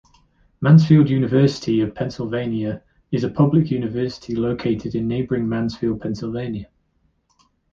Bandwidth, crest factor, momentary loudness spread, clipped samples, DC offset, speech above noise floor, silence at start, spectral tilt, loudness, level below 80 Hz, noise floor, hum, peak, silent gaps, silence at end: 7.2 kHz; 18 dB; 12 LU; under 0.1%; under 0.1%; 46 dB; 0.6 s; -8.5 dB/octave; -20 LUFS; -48 dBFS; -65 dBFS; none; -2 dBFS; none; 1.1 s